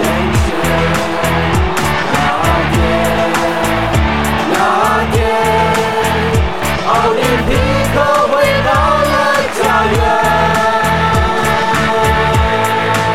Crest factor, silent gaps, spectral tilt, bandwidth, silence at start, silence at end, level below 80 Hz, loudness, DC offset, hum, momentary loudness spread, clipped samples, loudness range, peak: 12 dB; none; -5 dB/octave; 16.5 kHz; 0 s; 0 s; -24 dBFS; -12 LUFS; 3%; none; 3 LU; under 0.1%; 2 LU; 0 dBFS